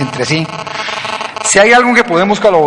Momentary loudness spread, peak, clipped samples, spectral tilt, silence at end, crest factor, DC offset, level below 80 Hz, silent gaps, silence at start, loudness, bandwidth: 13 LU; 0 dBFS; 0.2%; -3.5 dB/octave; 0 s; 12 dB; under 0.1%; -46 dBFS; none; 0 s; -11 LUFS; 11.5 kHz